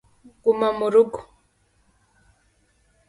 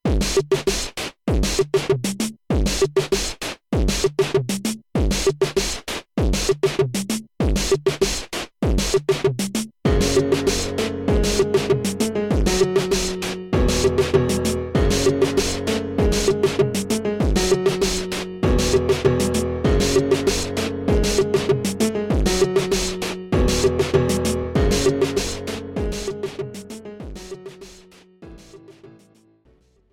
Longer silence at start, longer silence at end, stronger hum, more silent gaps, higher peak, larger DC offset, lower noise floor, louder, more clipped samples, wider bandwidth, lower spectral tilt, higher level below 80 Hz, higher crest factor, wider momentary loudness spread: first, 0.45 s vs 0.05 s; first, 1.85 s vs 1 s; neither; neither; about the same, -6 dBFS vs -4 dBFS; neither; first, -64 dBFS vs -57 dBFS; about the same, -21 LUFS vs -21 LUFS; neither; second, 11.5 kHz vs 16.5 kHz; first, -6 dB/octave vs -4.5 dB/octave; second, -62 dBFS vs -30 dBFS; about the same, 18 dB vs 16 dB; about the same, 7 LU vs 9 LU